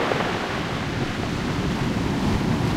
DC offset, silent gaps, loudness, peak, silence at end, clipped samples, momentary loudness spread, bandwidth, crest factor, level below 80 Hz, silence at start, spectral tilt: 0.2%; none; -25 LUFS; -6 dBFS; 0 s; under 0.1%; 3 LU; 16 kHz; 18 dB; -36 dBFS; 0 s; -6 dB/octave